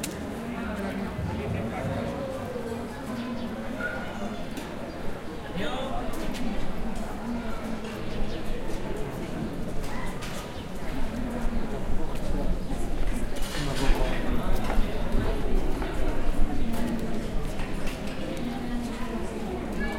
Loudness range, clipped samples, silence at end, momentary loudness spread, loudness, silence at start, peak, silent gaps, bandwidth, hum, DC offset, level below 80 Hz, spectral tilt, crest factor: 4 LU; under 0.1%; 0 s; 5 LU; -33 LUFS; 0 s; -8 dBFS; none; 14.5 kHz; none; under 0.1%; -30 dBFS; -5.5 dB/octave; 18 dB